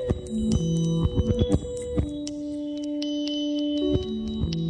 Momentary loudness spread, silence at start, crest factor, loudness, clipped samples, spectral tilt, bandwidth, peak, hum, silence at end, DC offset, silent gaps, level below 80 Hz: 7 LU; 0 s; 18 dB; -27 LUFS; under 0.1%; -7 dB/octave; 10 kHz; -8 dBFS; none; 0 s; under 0.1%; none; -36 dBFS